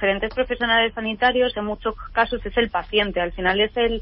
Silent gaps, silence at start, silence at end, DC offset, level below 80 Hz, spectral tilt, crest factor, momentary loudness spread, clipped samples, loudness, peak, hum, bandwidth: none; 0 s; 0 s; under 0.1%; -38 dBFS; -9 dB/octave; 14 dB; 6 LU; under 0.1%; -21 LUFS; -6 dBFS; none; 5.6 kHz